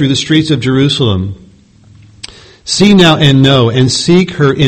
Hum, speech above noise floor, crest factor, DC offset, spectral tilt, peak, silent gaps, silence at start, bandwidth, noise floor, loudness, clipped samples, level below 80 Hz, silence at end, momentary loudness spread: none; 33 dB; 10 dB; under 0.1%; -5.5 dB/octave; 0 dBFS; none; 0 s; 9.8 kHz; -41 dBFS; -9 LUFS; 1%; -38 dBFS; 0 s; 23 LU